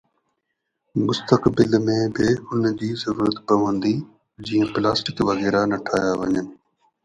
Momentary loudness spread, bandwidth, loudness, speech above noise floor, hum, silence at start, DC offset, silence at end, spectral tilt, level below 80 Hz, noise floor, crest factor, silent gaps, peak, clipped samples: 7 LU; 10.5 kHz; -21 LUFS; 57 dB; none; 0.95 s; under 0.1%; 0.5 s; -6 dB/octave; -52 dBFS; -77 dBFS; 20 dB; none; 0 dBFS; under 0.1%